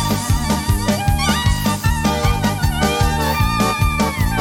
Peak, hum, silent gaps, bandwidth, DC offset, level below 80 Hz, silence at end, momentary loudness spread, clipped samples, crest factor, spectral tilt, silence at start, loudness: -2 dBFS; none; none; 17.5 kHz; under 0.1%; -24 dBFS; 0 s; 2 LU; under 0.1%; 14 dB; -4.5 dB/octave; 0 s; -17 LUFS